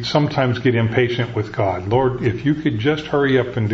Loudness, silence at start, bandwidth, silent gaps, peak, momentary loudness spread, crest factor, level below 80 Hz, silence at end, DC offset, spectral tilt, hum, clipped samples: -19 LUFS; 0 s; 7.4 kHz; none; -2 dBFS; 4 LU; 16 dB; -46 dBFS; 0 s; under 0.1%; -7.5 dB/octave; none; under 0.1%